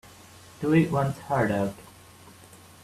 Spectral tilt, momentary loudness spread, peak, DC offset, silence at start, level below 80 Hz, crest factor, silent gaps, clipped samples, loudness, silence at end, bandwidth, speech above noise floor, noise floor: -7.5 dB/octave; 10 LU; -8 dBFS; under 0.1%; 0.6 s; -58 dBFS; 20 dB; none; under 0.1%; -26 LUFS; 1 s; 14.5 kHz; 26 dB; -50 dBFS